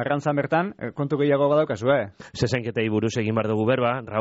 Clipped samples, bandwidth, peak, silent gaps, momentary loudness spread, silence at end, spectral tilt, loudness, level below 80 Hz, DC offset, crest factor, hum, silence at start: under 0.1%; 8 kHz; -10 dBFS; none; 7 LU; 0 s; -5.5 dB/octave; -23 LUFS; -56 dBFS; under 0.1%; 14 dB; none; 0 s